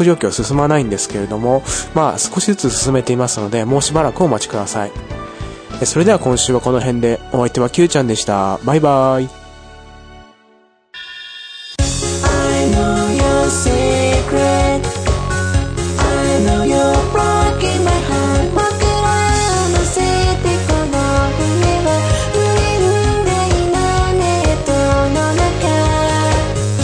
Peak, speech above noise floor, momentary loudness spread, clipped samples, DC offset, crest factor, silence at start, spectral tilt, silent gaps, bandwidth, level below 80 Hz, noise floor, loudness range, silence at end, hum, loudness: 0 dBFS; 37 dB; 6 LU; under 0.1%; under 0.1%; 14 dB; 0 s; -5 dB/octave; none; 10.5 kHz; -24 dBFS; -52 dBFS; 3 LU; 0 s; none; -15 LUFS